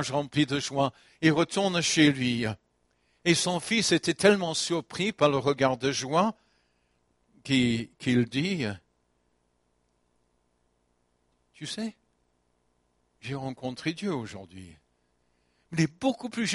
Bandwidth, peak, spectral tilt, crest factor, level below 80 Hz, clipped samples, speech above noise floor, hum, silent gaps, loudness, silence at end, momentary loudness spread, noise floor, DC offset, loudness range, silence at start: 11.5 kHz; -6 dBFS; -4.5 dB/octave; 24 dB; -64 dBFS; under 0.1%; 46 dB; 60 Hz at -55 dBFS; none; -27 LUFS; 0 s; 14 LU; -72 dBFS; under 0.1%; 18 LU; 0 s